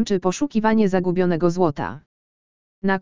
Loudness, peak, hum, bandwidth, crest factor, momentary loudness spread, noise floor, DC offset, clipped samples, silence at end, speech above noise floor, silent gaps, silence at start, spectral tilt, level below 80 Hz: -21 LUFS; -4 dBFS; none; 7.6 kHz; 16 dB; 9 LU; under -90 dBFS; under 0.1%; under 0.1%; 0 s; over 70 dB; 2.06-2.82 s; 0 s; -6.5 dB/octave; -50 dBFS